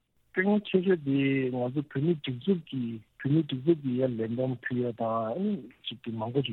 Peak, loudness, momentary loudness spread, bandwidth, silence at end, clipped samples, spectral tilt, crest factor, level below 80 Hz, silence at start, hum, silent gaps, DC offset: -12 dBFS; -30 LUFS; 9 LU; 4.2 kHz; 0 s; under 0.1%; -10 dB/octave; 18 dB; -72 dBFS; 0.35 s; none; none; under 0.1%